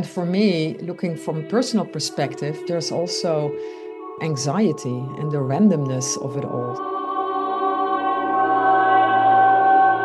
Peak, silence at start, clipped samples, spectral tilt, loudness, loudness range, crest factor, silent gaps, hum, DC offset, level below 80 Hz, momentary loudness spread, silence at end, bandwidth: -6 dBFS; 0 s; under 0.1%; -5 dB/octave; -20 LUFS; 6 LU; 14 dB; none; none; under 0.1%; -68 dBFS; 12 LU; 0 s; 12.5 kHz